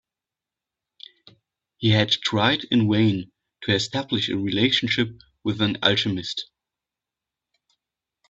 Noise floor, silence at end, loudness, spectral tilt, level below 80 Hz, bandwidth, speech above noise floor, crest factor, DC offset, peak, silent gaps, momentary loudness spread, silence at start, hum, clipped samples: -89 dBFS; 1.85 s; -22 LUFS; -5 dB/octave; -58 dBFS; 8 kHz; 67 dB; 24 dB; under 0.1%; -2 dBFS; none; 11 LU; 1.8 s; none; under 0.1%